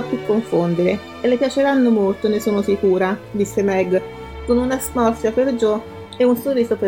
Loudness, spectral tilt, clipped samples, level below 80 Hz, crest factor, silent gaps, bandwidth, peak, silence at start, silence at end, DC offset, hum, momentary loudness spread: -18 LUFS; -6 dB/octave; under 0.1%; -44 dBFS; 14 dB; none; 17.5 kHz; -4 dBFS; 0 s; 0 s; 0.1%; none; 5 LU